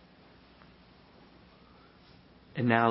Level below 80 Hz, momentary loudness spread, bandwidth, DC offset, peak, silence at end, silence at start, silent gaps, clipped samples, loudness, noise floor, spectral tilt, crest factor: -66 dBFS; 30 LU; 5.6 kHz; under 0.1%; -8 dBFS; 0 s; 2.55 s; none; under 0.1%; -29 LUFS; -58 dBFS; -5 dB/octave; 26 dB